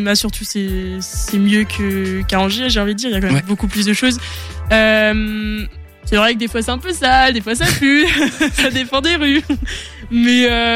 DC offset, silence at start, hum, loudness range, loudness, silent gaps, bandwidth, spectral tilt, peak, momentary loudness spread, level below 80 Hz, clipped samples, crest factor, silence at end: under 0.1%; 0 s; none; 3 LU; -15 LUFS; none; 16.5 kHz; -4 dB/octave; -2 dBFS; 11 LU; -28 dBFS; under 0.1%; 14 dB; 0 s